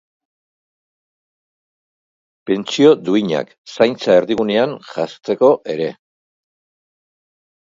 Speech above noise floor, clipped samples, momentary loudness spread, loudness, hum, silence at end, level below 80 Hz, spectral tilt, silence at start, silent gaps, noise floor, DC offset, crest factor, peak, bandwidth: over 74 dB; under 0.1%; 12 LU; -16 LUFS; none; 1.75 s; -64 dBFS; -5.5 dB/octave; 2.45 s; 3.58-3.65 s; under -90 dBFS; under 0.1%; 20 dB; 0 dBFS; 7.6 kHz